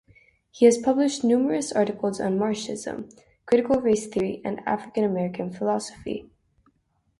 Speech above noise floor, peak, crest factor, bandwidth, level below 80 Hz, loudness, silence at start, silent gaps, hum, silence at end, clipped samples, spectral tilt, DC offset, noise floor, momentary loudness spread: 45 dB; -4 dBFS; 20 dB; 11.5 kHz; -60 dBFS; -24 LUFS; 0.55 s; none; none; 1 s; under 0.1%; -5.5 dB/octave; under 0.1%; -68 dBFS; 14 LU